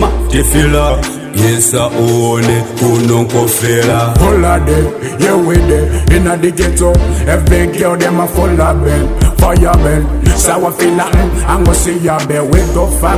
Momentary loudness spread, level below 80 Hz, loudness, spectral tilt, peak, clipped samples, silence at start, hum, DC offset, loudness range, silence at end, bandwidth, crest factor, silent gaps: 3 LU; -14 dBFS; -11 LUFS; -5.5 dB/octave; 0 dBFS; 0.1%; 0 s; none; 0.2%; 1 LU; 0 s; 16 kHz; 10 dB; none